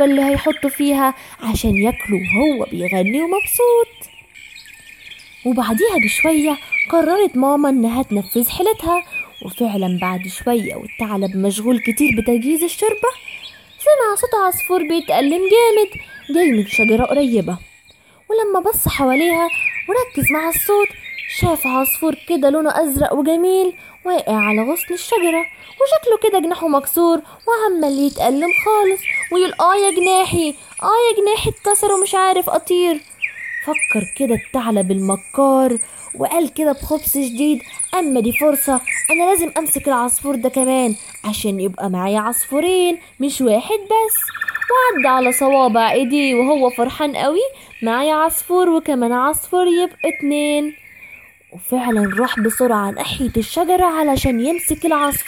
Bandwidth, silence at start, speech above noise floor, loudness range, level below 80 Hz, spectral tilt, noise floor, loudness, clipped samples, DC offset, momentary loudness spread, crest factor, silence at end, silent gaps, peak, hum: 17 kHz; 0 s; 33 dB; 3 LU; -42 dBFS; -4 dB/octave; -50 dBFS; -16 LUFS; under 0.1%; under 0.1%; 8 LU; 14 dB; 0 s; none; -2 dBFS; none